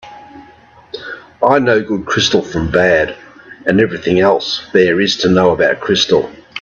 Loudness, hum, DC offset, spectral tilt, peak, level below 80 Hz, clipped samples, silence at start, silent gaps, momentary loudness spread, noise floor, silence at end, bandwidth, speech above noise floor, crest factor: -13 LUFS; none; under 0.1%; -4.5 dB/octave; 0 dBFS; -42 dBFS; under 0.1%; 0.05 s; none; 15 LU; -43 dBFS; 0 s; 7.4 kHz; 30 dB; 14 dB